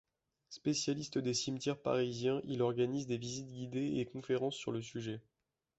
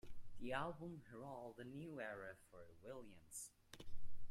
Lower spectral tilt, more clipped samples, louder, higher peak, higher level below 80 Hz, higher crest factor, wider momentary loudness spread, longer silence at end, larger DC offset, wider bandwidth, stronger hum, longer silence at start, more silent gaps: about the same, -5.5 dB/octave vs -4.5 dB/octave; neither; first, -37 LUFS vs -53 LUFS; first, -20 dBFS vs -30 dBFS; second, -72 dBFS vs -62 dBFS; about the same, 18 dB vs 16 dB; second, 8 LU vs 16 LU; first, 0.6 s vs 0 s; neither; second, 8 kHz vs 15 kHz; neither; first, 0.5 s vs 0.05 s; neither